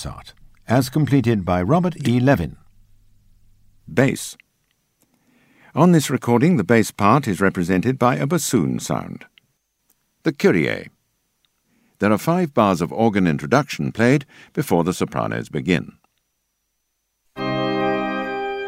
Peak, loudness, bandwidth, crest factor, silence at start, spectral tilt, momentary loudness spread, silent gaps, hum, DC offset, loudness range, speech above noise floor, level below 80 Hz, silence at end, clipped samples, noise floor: 0 dBFS; -19 LUFS; 16 kHz; 20 dB; 0 s; -6 dB/octave; 10 LU; none; none; under 0.1%; 7 LU; 55 dB; -50 dBFS; 0 s; under 0.1%; -73 dBFS